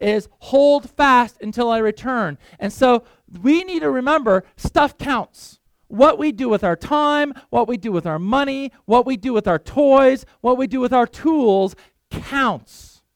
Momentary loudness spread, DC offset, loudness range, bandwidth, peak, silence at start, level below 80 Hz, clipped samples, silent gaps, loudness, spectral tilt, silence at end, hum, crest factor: 9 LU; under 0.1%; 2 LU; 15.5 kHz; -2 dBFS; 0 s; -44 dBFS; under 0.1%; none; -18 LUFS; -6 dB/octave; 0.55 s; none; 16 dB